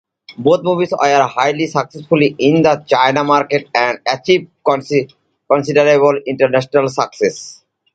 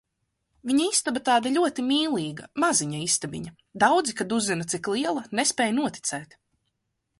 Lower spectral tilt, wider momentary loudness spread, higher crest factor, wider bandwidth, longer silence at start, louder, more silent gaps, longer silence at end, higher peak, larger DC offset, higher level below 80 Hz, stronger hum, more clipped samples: first, -5.5 dB/octave vs -3 dB/octave; second, 7 LU vs 10 LU; second, 14 dB vs 20 dB; second, 9 kHz vs 11.5 kHz; second, 0.3 s vs 0.65 s; first, -14 LUFS vs -24 LUFS; neither; second, 0.4 s vs 0.95 s; first, 0 dBFS vs -6 dBFS; neither; first, -58 dBFS vs -66 dBFS; neither; neither